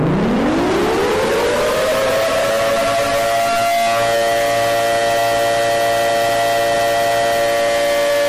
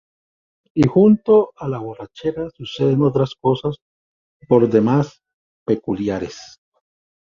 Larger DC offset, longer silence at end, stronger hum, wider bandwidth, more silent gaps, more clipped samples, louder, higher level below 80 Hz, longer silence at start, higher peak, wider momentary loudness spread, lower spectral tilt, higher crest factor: neither; second, 0 s vs 0.85 s; neither; first, 16 kHz vs 7.4 kHz; second, none vs 3.82-4.40 s, 5.34-5.66 s; neither; about the same, -16 LUFS vs -18 LUFS; first, -40 dBFS vs -52 dBFS; second, 0 s vs 0.75 s; second, -10 dBFS vs -2 dBFS; second, 1 LU vs 15 LU; second, -3.5 dB/octave vs -8.5 dB/octave; second, 6 dB vs 18 dB